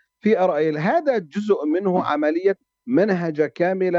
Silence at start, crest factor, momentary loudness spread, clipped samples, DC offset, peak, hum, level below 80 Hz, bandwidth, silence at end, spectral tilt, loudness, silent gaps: 0.25 s; 14 dB; 4 LU; under 0.1%; under 0.1%; -6 dBFS; none; -70 dBFS; 7.6 kHz; 0 s; -8 dB/octave; -21 LUFS; none